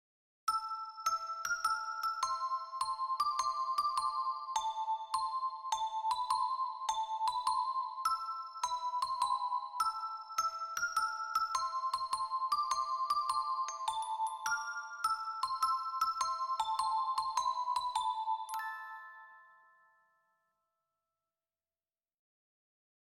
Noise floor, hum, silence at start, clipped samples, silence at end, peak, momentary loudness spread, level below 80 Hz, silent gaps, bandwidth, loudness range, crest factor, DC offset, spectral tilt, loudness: under -90 dBFS; none; 0.45 s; under 0.1%; 3.75 s; -18 dBFS; 4 LU; -74 dBFS; none; 16 kHz; 3 LU; 18 dB; under 0.1%; 2 dB/octave; -36 LUFS